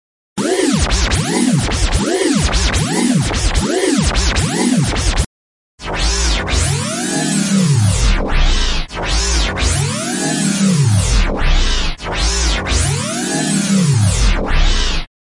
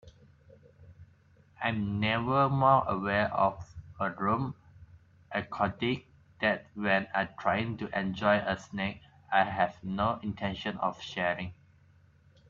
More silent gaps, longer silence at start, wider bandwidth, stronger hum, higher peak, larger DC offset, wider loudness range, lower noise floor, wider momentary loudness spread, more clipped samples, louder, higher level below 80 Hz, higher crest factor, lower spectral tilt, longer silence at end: first, 5.26-5.78 s vs none; first, 0.35 s vs 0.05 s; first, 11.5 kHz vs 7.4 kHz; neither; first, -2 dBFS vs -10 dBFS; neither; second, 1 LU vs 4 LU; first, under -90 dBFS vs -62 dBFS; second, 5 LU vs 10 LU; neither; first, -16 LUFS vs -30 LUFS; first, -18 dBFS vs -60 dBFS; second, 12 dB vs 22 dB; second, -4 dB/octave vs -7 dB/octave; second, 0.25 s vs 0.95 s